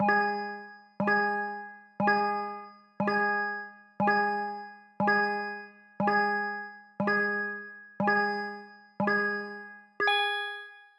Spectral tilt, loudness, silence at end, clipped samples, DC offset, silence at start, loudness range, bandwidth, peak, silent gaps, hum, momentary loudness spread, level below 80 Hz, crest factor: -6 dB/octave; -29 LUFS; 0.15 s; under 0.1%; under 0.1%; 0 s; 1 LU; 10.5 kHz; -14 dBFS; none; none; 17 LU; -78 dBFS; 18 dB